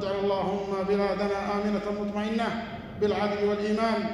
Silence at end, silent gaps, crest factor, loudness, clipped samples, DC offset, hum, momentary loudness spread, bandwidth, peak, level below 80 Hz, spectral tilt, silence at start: 0 s; none; 14 dB; -28 LUFS; under 0.1%; under 0.1%; none; 4 LU; 11 kHz; -14 dBFS; -52 dBFS; -6.5 dB/octave; 0 s